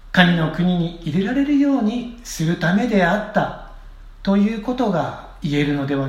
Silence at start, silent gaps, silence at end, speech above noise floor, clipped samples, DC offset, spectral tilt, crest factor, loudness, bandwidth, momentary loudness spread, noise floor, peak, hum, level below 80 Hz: 0.05 s; none; 0 s; 20 dB; under 0.1%; under 0.1%; -6.5 dB/octave; 20 dB; -20 LUFS; 15 kHz; 11 LU; -38 dBFS; 0 dBFS; none; -40 dBFS